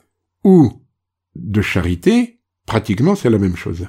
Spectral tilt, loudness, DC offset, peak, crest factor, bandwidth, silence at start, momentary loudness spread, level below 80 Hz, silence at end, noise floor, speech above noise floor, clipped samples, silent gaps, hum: -7.5 dB/octave; -16 LUFS; under 0.1%; 0 dBFS; 16 dB; 15.5 kHz; 0.45 s; 10 LU; -40 dBFS; 0 s; -69 dBFS; 54 dB; under 0.1%; none; none